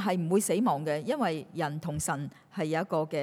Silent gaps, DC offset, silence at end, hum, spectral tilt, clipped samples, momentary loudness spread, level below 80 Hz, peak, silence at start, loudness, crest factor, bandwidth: none; under 0.1%; 0 s; none; -5.5 dB/octave; under 0.1%; 7 LU; -64 dBFS; -16 dBFS; 0 s; -30 LUFS; 14 dB; over 20 kHz